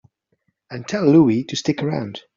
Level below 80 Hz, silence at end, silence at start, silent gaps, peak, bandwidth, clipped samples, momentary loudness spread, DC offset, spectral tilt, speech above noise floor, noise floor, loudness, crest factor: -60 dBFS; 0.15 s; 0.7 s; none; -2 dBFS; 7.6 kHz; under 0.1%; 16 LU; under 0.1%; -6.5 dB/octave; 51 dB; -69 dBFS; -18 LUFS; 18 dB